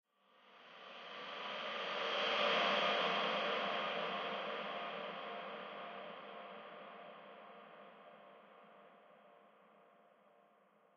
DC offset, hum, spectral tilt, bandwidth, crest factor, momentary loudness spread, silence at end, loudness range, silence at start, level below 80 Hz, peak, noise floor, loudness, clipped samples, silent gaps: under 0.1%; none; 0.5 dB/octave; 6.8 kHz; 20 dB; 25 LU; 1.15 s; 21 LU; 0.45 s; under -90 dBFS; -24 dBFS; -70 dBFS; -39 LUFS; under 0.1%; none